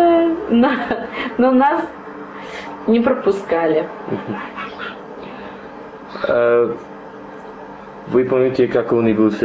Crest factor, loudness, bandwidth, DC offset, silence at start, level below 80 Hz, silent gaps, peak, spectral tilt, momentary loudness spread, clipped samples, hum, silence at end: 14 dB; -17 LUFS; 7.8 kHz; under 0.1%; 0 s; -52 dBFS; none; -4 dBFS; -7.5 dB/octave; 20 LU; under 0.1%; none; 0 s